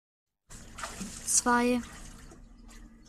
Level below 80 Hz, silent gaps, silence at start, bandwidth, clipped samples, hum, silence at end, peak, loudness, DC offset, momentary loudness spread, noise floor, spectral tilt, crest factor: -52 dBFS; none; 0.5 s; 15 kHz; under 0.1%; none; 0.2 s; -10 dBFS; -28 LUFS; under 0.1%; 24 LU; -51 dBFS; -2 dB/octave; 22 dB